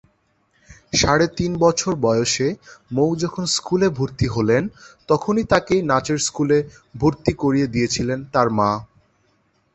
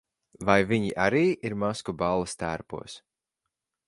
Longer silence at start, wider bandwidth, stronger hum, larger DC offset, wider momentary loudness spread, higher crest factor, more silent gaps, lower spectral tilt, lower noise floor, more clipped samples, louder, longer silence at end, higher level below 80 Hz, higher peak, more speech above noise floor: first, 0.7 s vs 0.4 s; second, 8.4 kHz vs 11.5 kHz; neither; neither; second, 5 LU vs 16 LU; about the same, 20 dB vs 24 dB; neither; about the same, -4.5 dB/octave vs -5.5 dB/octave; second, -64 dBFS vs -85 dBFS; neither; first, -20 LUFS vs -27 LUFS; about the same, 0.9 s vs 0.9 s; first, -44 dBFS vs -54 dBFS; first, 0 dBFS vs -4 dBFS; second, 44 dB vs 59 dB